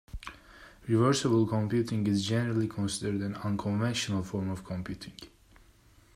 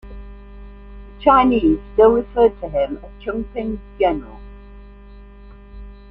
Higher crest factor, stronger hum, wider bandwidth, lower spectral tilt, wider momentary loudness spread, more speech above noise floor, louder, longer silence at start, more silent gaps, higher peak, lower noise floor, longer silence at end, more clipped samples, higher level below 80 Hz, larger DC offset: about the same, 18 dB vs 18 dB; second, none vs 50 Hz at -35 dBFS; first, 14.5 kHz vs 4.4 kHz; second, -6 dB/octave vs -9 dB/octave; first, 19 LU vs 16 LU; first, 31 dB vs 24 dB; second, -30 LUFS vs -18 LUFS; about the same, 0.15 s vs 0.05 s; neither; second, -12 dBFS vs -2 dBFS; first, -60 dBFS vs -41 dBFS; first, 0.9 s vs 0.15 s; neither; second, -56 dBFS vs -36 dBFS; neither